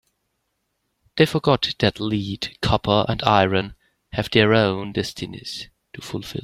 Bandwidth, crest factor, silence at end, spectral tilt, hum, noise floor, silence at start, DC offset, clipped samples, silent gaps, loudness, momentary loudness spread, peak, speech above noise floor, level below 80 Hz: 15 kHz; 22 dB; 0 s; -6 dB/octave; none; -74 dBFS; 1.15 s; under 0.1%; under 0.1%; none; -21 LUFS; 15 LU; 0 dBFS; 53 dB; -46 dBFS